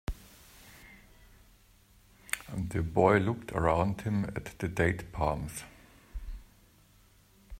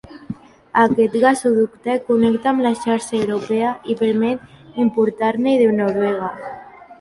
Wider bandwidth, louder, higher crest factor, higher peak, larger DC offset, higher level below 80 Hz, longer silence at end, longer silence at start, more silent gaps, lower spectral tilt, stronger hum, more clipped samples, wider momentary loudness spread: first, 16 kHz vs 11.5 kHz; second, -31 LUFS vs -18 LUFS; first, 24 dB vs 16 dB; second, -8 dBFS vs -2 dBFS; neither; first, -48 dBFS vs -58 dBFS; about the same, 0 s vs 0.05 s; about the same, 0.1 s vs 0.1 s; neither; about the same, -6.5 dB/octave vs -6 dB/octave; neither; neither; first, 26 LU vs 17 LU